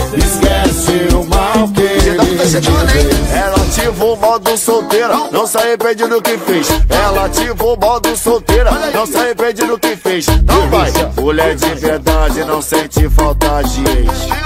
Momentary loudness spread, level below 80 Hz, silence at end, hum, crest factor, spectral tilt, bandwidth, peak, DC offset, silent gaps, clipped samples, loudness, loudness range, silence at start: 3 LU; -18 dBFS; 0 s; none; 12 dB; -4.5 dB/octave; 16.5 kHz; 0 dBFS; under 0.1%; none; under 0.1%; -12 LUFS; 1 LU; 0 s